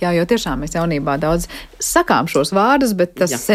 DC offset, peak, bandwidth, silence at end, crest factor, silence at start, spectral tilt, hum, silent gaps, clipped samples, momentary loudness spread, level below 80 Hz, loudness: under 0.1%; -2 dBFS; 16 kHz; 0 s; 16 dB; 0 s; -4.5 dB/octave; none; none; under 0.1%; 7 LU; -36 dBFS; -17 LUFS